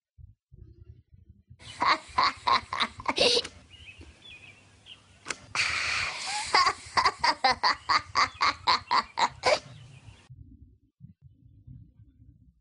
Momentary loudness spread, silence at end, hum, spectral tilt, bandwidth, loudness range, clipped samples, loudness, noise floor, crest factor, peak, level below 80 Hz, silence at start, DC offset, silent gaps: 23 LU; 0.8 s; none; -1.5 dB/octave; 10.5 kHz; 6 LU; under 0.1%; -26 LUFS; -57 dBFS; 24 dB; -6 dBFS; -58 dBFS; 0.2 s; under 0.1%; 0.43-0.47 s